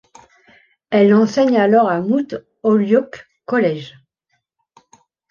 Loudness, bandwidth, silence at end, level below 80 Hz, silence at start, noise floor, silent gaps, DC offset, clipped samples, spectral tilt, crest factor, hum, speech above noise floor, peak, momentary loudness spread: -16 LUFS; 7 kHz; 1.4 s; -64 dBFS; 0.9 s; -70 dBFS; none; under 0.1%; under 0.1%; -7 dB/octave; 16 dB; none; 55 dB; -2 dBFS; 16 LU